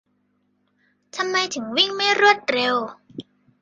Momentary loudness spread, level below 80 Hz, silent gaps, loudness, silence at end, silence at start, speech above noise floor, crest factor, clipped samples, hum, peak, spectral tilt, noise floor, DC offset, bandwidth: 22 LU; -72 dBFS; none; -19 LUFS; 0.4 s; 1.15 s; 47 dB; 22 dB; under 0.1%; 50 Hz at -50 dBFS; -2 dBFS; -1.5 dB/octave; -68 dBFS; under 0.1%; 9.4 kHz